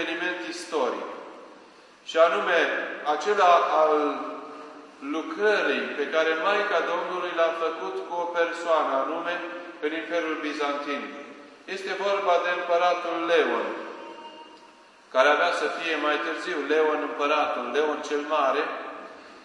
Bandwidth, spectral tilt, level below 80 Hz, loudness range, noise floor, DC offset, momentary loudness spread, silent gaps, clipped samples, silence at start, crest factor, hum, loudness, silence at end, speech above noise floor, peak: 11.5 kHz; -2.5 dB/octave; -82 dBFS; 4 LU; -52 dBFS; under 0.1%; 17 LU; none; under 0.1%; 0 s; 22 dB; none; -25 LUFS; 0 s; 28 dB; -4 dBFS